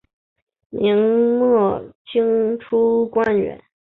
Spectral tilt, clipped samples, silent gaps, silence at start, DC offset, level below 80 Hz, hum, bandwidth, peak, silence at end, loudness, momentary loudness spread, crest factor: -9 dB/octave; under 0.1%; 1.95-2.05 s; 0.75 s; under 0.1%; -56 dBFS; none; 4.1 kHz; -6 dBFS; 0.3 s; -18 LUFS; 8 LU; 12 dB